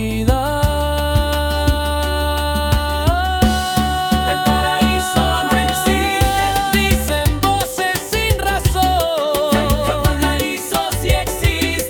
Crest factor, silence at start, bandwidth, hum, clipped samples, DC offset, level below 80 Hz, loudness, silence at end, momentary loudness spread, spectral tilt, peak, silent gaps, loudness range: 16 dB; 0 s; 18 kHz; none; under 0.1%; under 0.1%; -24 dBFS; -17 LUFS; 0 s; 3 LU; -4.5 dB/octave; -2 dBFS; none; 2 LU